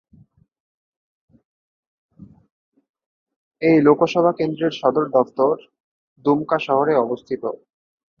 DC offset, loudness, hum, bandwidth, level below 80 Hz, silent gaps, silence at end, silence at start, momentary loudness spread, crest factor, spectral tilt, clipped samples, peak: under 0.1%; -19 LUFS; none; 7 kHz; -66 dBFS; 2.51-2.72 s, 2.89-2.94 s, 3.06-3.27 s, 3.36-3.51 s, 5.80-6.16 s; 0.65 s; 2.2 s; 12 LU; 20 dB; -7.5 dB/octave; under 0.1%; -2 dBFS